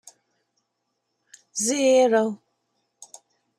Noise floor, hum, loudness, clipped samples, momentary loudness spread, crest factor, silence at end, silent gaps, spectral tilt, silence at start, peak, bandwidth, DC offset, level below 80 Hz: -77 dBFS; none; -21 LUFS; under 0.1%; 15 LU; 18 dB; 1.25 s; none; -2.5 dB/octave; 1.55 s; -8 dBFS; 14.5 kHz; under 0.1%; -78 dBFS